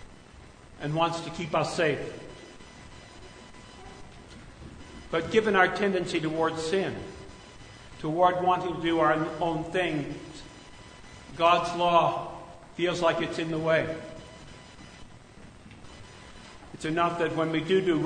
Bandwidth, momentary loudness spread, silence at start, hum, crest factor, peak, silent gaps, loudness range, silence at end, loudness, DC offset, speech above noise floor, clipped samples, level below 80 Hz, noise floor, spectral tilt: 9.6 kHz; 24 LU; 0 s; none; 22 dB; -6 dBFS; none; 8 LU; 0 s; -27 LUFS; under 0.1%; 24 dB; under 0.1%; -54 dBFS; -50 dBFS; -5.5 dB/octave